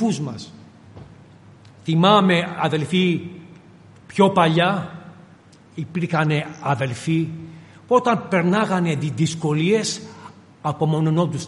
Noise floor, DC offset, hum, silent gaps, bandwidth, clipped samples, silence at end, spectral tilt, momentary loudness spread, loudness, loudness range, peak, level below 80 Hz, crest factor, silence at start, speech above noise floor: -48 dBFS; under 0.1%; none; none; 11.5 kHz; under 0.1%; 0 s; -6 dB/octave; 18 LU; -20 LUFS; 4 LU; 0 dBFS; -62 dBFS; 20 dB; 0 s; 29 dB